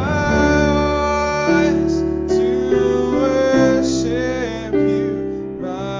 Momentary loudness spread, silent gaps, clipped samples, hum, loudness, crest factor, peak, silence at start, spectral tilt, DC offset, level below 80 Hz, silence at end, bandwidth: 8 LU; none; under 0.1%; none; -17 LUFS; 14 dB; -4 dBFS; 0 s; -6 dB/octave; under 0.1%; -32 dBFS; 0 s; 7.6 kHz